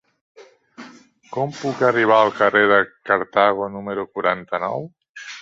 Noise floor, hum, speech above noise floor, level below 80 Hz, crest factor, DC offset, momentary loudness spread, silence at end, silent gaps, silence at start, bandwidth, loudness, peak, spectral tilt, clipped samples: -46 dBFS; none; 27 dB; -62 dBFS; 20 dB; under 0.1%; 15 LU; 0 s; 5.09-5.14 s; 0.4 s; 7.8 kHz; -19 LUFS; -2 dBFS; -5.5 dB/octave; under 0.1%